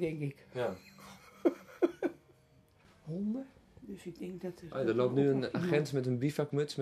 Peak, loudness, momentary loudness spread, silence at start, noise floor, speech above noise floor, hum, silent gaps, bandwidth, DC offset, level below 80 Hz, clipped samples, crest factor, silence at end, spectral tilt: -16 dBFS; -35 LUFS; 20 LU; 0 s; -65 dBFS; 31 dB; none; none; 14 kHz; under 0.1%; -70 dBFS; under 0.1%; 20 dB; 0 s; -7 dB/octave